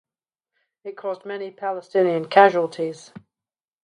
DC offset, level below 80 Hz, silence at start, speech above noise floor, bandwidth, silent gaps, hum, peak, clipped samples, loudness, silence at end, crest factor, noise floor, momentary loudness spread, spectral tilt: under 0.1%; -76 dBFS; 0.85 s; over 69 dB; 10.5 kHz; none; none; 0 dBFS; under 0.1%; -21 LUFS; 0.85 s; 22 dB; under -90 dBFS; 21 LU; -5.5 dB/octave